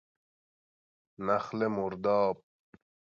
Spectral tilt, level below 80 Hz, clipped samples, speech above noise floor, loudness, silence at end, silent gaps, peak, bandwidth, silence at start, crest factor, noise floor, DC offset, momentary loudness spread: -7.5 dB/octave; -70 dBFS; under 0.1%; over 60 dB; -31 LUFS; 0.7 s; none; -16 dBFS; 7.2 kHz; 1.2 s; 18 dB; under -90 dBFS; under 0.1%; 8 LU